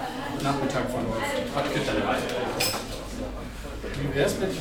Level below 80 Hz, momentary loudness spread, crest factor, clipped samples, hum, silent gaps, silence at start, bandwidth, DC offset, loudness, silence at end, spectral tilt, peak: -42 dBFS; 9 LU; 18 dB; under 0.1%; none; none; 0 s; 19 kHz; under 0.1%; -28 LUFS; 0 s; -4.5 dB/octave; -10 dBFS